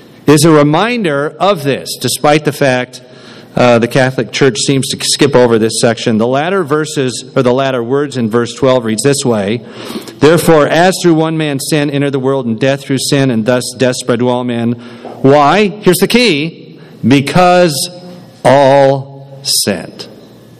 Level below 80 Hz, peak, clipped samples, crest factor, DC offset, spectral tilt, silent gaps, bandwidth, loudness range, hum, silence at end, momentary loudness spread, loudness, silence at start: -44 dBFS; 0 dBFS; 0.9%; 10 dB; under 0.1%; -5 dB/octave; none; 15.5 kHz; 3 LU; none; 0.45 s; 10 LU; -11 LUFS; 0.25 s